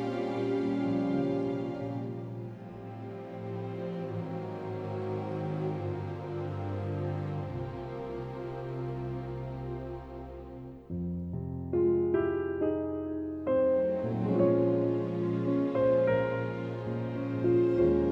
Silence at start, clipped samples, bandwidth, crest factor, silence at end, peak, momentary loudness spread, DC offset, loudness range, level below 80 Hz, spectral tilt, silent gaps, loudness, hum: 0 s; under 0.1%; 6.2 kHz; 16 dB; 0 s; -14 dBFS; 14 LU; under 0.1%; 10 LU; -54 dBFS; -10 dB/octave; none; -32 LUFS; none